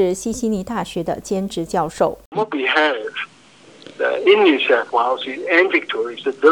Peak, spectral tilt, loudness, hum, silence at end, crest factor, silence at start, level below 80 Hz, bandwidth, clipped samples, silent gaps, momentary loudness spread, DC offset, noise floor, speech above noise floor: -2 dBFS; -4.5 dB/octave; -18 LUFS; none; 0 s; 18 dB; 0 s; -50 dBFS; 18 kHz; under 0.1%; 2.26-2.32 s; 11 LU; under 0.1%; -46 dBFS; 28 dB